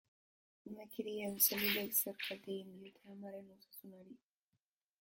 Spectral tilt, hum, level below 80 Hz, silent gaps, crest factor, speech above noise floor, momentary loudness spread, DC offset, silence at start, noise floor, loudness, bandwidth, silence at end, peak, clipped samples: -2 dB/octave; none; -80 dBFS; none; 26 dB; 46 dB; 24 LU; under 0.1%; 0.65 s; -88 dBFS; -37 LUFS; 17 kHz; 0.85 s; -16 dBFS; under 0.1%